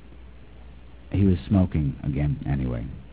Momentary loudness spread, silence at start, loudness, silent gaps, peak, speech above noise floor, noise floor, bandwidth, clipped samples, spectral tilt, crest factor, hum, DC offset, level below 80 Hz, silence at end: 8 LU; 0.05 s; -25 LUFS; none; -8 dBFS; 22 dB; -46 dBFS; 4 kHz; under 0.1%; -12.5 dB/octave; 16 dB; none; 0.4%; -36 dBFS; 0 s